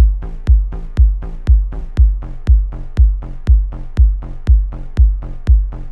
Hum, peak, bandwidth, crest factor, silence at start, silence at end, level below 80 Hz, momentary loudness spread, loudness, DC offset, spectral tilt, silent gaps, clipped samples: none; -2 dBFS; 2.8 kHz; 12 dB; 0 s; 0 s; -14 dBFS; 7 LU; -17 LUFS; under 0.1%; -9 dB/octave; none; under 0.1%